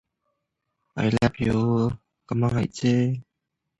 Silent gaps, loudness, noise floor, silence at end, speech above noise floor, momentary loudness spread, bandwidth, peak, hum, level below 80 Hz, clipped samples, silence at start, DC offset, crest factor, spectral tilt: none; -24 LUFS; -81 dBFS; 0.55 s; 59 dB; 10 LU; 10.5 kHz; -6 dBFS; none; -48 dBFS; under 0.1%; 0.95 s; under 0.1%; 18 dB; -7.5 dB/octave